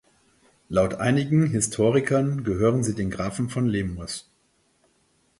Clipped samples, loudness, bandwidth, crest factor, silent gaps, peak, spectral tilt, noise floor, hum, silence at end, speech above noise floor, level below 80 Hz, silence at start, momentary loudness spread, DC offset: under 0.1%; -24 LUFS; 11.5 kHz; 16 dB; none; -8 dBFS; -6 dB/octave; -66 dBFS; none; 1.2 s; 43 dB; -48 dBFS; 0.7 s; 8 LU; under 0.1%